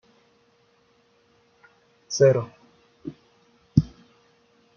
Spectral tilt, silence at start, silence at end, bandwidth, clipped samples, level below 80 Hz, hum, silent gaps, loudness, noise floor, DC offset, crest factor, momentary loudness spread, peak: -7 dB/octave; 2.1 s; 0.9 s; 7 kHz; under 0.1%; -52 dBFS; none; none; -22 LUFS; -63 dBFS; under 0.1%; 26 dB; 22 LU; -2 dBFS